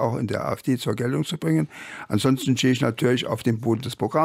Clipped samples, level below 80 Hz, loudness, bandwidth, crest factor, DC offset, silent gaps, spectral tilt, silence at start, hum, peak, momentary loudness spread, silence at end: under 0.1%; -62 dBFS; -24 LUFS; 16 kHz; 16 dB; under 0.1%; none; -6 dB/octave; 0 s; none; -8 dBFS; 5 LU; 0 s